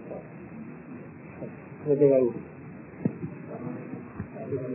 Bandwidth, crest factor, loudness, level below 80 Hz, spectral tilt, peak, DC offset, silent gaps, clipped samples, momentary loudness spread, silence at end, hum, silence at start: 2.9 kHz; 22 dB; -29 LUFS; -60 dBFS; -14 dB/octave; -8 dBFS; under 0.1%; none; under 0.1%; 21 LU; 0 s; none; 0 s